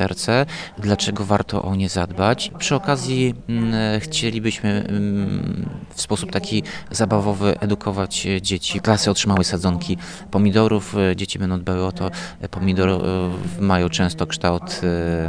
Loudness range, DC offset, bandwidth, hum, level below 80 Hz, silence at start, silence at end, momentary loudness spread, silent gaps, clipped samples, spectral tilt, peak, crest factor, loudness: 3 LU; 0.3%; 10.5 kHz; none; -42 dBFS; 0 s; 0 s; 7 LU; none; under 0.1%; -5 dB/octave; 0 dBFS; 20 dB; -21 LUFS